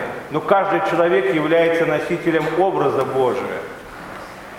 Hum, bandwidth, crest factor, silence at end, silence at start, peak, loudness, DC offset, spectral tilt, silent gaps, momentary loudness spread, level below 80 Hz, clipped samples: none; 16 kHz; 18 dB; 0 s; 0 s; 0 dBFS; -18 LUFS; under 0.1%; -6.5 dB/octave; none; 17 LU; -54 dBFS; under 0.1%